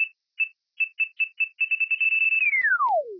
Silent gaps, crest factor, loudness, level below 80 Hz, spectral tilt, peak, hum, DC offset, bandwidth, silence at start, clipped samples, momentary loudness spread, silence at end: none; 10 dB; -22 LUFS; under -90 dBFS; -1 dB/octave; -14 dBFS; none; under 0.1%; 5.4 kHz; 0 s; under 0.1%; 9 LU; 0 s